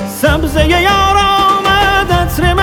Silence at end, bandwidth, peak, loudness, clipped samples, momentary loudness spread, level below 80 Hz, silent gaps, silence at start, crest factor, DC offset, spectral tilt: 0 s; 18.5 kHz; 0 dBFS; -10 LUFS; under 0.1%; 3 LU; -20 dBFS; none; 0 s; 10 dB; under 0.1%; -4.5 dB/octave